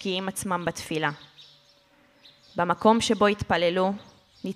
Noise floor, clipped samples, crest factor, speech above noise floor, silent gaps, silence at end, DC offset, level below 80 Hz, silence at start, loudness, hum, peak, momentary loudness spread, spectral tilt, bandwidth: -60 dBFS; under 0.1%; 20 dB; 35 dB; none; 0 s; under 0.1%; -56 dBFS; 0 s; -25 LUFS; none; -6 dBFS; 16 LU; -4.5 dB/octave; 15 kHz